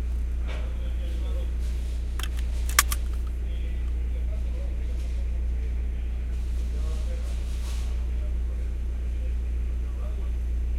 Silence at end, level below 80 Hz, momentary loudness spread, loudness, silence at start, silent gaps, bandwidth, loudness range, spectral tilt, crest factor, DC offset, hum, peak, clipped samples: 0 s; -28 dBFS; 2 LU; -30 LUFS; 0 s; none; 16 kHz; 3 LU; -4 dB/octave; 26 dB; under 0.1%; none; 0 dBFS; under 0.1%